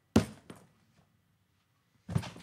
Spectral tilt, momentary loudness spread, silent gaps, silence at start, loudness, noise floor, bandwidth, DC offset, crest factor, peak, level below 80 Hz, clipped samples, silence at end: -6.5 dB/octave; 25 LU; none; 0.15 s; -34 LUFS; -74 dBFS; 15.5 kHz; under 0.1%; 28 dB; -8 dBFS; -56 dBFS; under 0.1%; 0 s